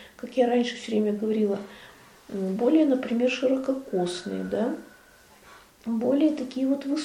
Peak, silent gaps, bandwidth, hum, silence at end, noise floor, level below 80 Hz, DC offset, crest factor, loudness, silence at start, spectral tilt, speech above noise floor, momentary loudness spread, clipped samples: -10 dBFS; none; 14.5 kHz; none; 0 s; -54 dBFS; -66 dBFS; under 0.1%; 16 dB; -26 LUFS; 0 s; -6 dB/octave; 29 dB; 10 LU; under 0.1%